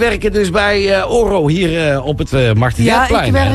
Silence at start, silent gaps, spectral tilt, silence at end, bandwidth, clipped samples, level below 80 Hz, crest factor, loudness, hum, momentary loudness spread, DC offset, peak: 0 s; none; -6 dB/octave; 0 s; 13 kHz; under 0.1%; -26 dBFS; 12 dB; -13 LUFS; none; 3 LU; under 0.1%; -2 dBFS